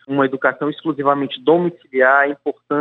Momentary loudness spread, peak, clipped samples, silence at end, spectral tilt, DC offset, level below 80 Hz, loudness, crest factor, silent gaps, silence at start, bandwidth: 9 LU; 0 dBFS; under 0.1%; 0 s; -8.5 dB/octave; under 0.1%; -70 dBFS; -17 LUFS; 16 dB; none; 0.1 s; 4.1 kHz